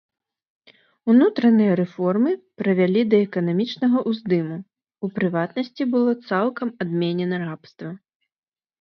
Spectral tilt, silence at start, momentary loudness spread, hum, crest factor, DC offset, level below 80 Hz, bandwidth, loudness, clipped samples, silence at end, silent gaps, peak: -9 dB/octave; 1.05 s; 14 LU; none; 16 dB; under 0.1%; -70 dBFS; 6 kHz; -21 LUFS; under 0.1%; 0.85 s; none; -6 dBFS